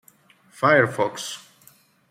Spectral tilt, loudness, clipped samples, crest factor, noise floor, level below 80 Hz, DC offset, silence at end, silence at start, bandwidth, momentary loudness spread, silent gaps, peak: -4.5 dB/octave; -21 LUFS; under 0.1%; 20 dB; -56 dBFS; -70 dBFS; under 0.1%; 0.75 s; 0.6 s; 16 kHz; 16 LU; none; -4 dBFS